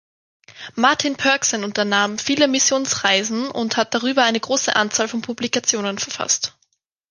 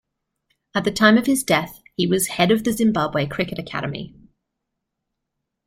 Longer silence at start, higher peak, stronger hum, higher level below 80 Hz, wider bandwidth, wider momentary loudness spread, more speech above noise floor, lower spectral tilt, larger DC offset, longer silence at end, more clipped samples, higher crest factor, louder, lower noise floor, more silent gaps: second, 0.5 s vs 0.75 s; about the same, -2 dBFS vs -2 dBFS; neither; second, -62 dBFS vs -54 dBFS; second, 11 kHz vs 16 kHz; second, 7 LU vs 13 LU; second, 48 dB vs 60 dB; second, -1.5 dB/octave vs -4.5 dB/octave; neither; second, 0.6 s vs 1.6 s; neither; about the same, 20 dB vs 20 dB; about the same, -19 LUFS vs -20 LUFS; second, -68 dBFS vs -80 dBFS; neither